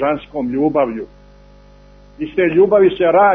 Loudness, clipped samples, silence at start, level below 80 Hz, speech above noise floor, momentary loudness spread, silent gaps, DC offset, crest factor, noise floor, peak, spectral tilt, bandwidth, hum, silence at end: -15 LUFS; under 0.1%; 0 s; -46 dBFS; 30 dB; 16 LU; none; under 0.1%; 14 dB; -44 dBFS; -2 dBFS; -9 dB/octave; 3.9 kHz; 50 Hz at -45 dBFS; 0 s